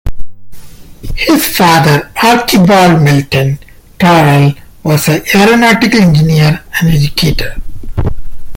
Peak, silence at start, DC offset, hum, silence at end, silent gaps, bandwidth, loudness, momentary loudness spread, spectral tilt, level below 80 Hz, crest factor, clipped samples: 0 dBFS; 0.05 s; under 0.1%; none; 0 s; none; 17.5 kHz; -8 LUFS; 13 LU; -5.5 dB/octave; -24 dBFS; 8 dB; under 0.1%